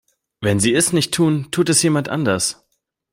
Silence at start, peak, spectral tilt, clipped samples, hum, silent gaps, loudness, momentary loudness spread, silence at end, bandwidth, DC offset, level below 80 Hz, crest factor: 0.4 s; -2 dBFS; -4 dB/octave; under 0.1%; none; none; -17 LUFS; 6 LU; 0.6 s; 16.5 kHz; under 0.1%; -54 dBFS; 16 dB